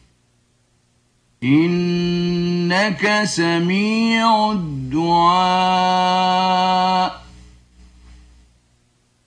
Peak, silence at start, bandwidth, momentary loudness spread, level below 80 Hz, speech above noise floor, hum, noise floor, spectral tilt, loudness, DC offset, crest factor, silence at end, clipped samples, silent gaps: -4 dBFS; 1.4 s; 10 kHz; 5 LU; -50 dBFS; 44 dB; none; -61 dBFS; -5 dB/octave; -17 LUFS; under 0.1%; 16 dB; 1.1 s; under 0.1%; none